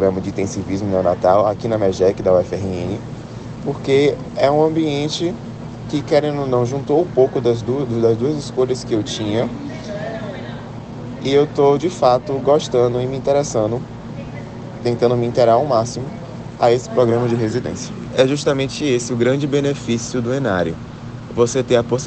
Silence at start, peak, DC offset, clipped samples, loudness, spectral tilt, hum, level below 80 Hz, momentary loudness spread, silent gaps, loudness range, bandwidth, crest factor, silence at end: 0 s; 0 dBFS; under 0.1%; under 0.1%; -18 LUFS; -6 dB/octave; none; -46 dBFS; 15 LU; none; 2 LU; 9 kHz; 16 dB; 0 s